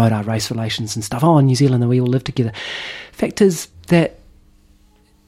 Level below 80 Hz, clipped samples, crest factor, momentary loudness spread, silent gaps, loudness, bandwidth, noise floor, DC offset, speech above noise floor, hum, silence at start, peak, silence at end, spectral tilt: -48 dBFS; under 0.1%; 16 dB; 12 LU; none; -18 LUFS; 15.5 kHz; -53 dBFS; under 0.1%; 36 dB; none; 0 s; -2 dBFS; 1.15 s; -6 dB/octave